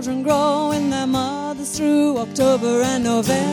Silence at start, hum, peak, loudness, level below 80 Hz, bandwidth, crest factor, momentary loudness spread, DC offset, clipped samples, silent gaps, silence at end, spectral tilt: 0 s; none; -4 dBFS; -19 LUFS; -50 dBFS; 17 kHz; 14 dB; 5 LU; under 0.1%; under 0.1%; none; 0 s; -4.5 dB/octave